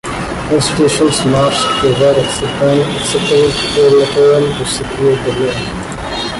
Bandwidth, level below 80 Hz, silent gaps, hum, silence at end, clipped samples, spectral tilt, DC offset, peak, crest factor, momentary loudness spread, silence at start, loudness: 11.5 kHz; -34 dBFS; none; none; 0 s; under 0.1%; -4.5 dB/octave; under 0.1%; -2 dBFS; 10 dB; 10 LU; 0.05 s; -12 LUFS